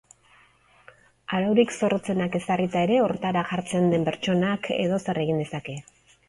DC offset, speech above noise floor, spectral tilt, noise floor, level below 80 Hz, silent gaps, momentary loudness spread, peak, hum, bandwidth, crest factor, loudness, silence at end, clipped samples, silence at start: under 0.1%; 34 dB; -6 dB/octave; -58 dBFS; -60 dBFS; none; 9 LU; -8 dBFS; none; 11.5 kHz; 18 dB; -25 LUFS; 0.5 s; under 0.1%; 1.3 s